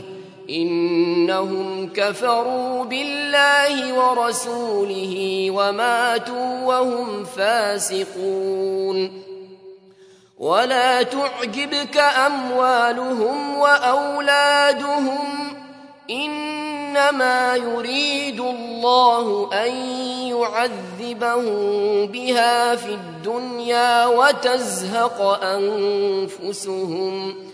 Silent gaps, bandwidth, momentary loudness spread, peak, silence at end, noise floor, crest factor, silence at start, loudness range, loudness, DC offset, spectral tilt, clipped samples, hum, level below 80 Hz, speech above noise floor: none; 11 kHz; 11 LU; -2 dBFS; 0 s; -50 dBFS; 18 dB; 0 s; 4 LU; -20 LUFS; under 0.1%; -3 dB/octave; under 0.1%; none; -76 dBFS; 30 dB